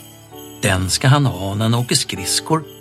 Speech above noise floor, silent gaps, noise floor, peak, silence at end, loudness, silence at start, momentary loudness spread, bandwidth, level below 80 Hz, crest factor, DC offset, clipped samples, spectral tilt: 21 dB; none; -38 dBFS; 0 dBFS; 0 s; -17 LUFS; 0 s; 7 LU; 15 kHz; -46 dBFS; 18 dB; under 0.1%; under 0.1%; -4 dB/octave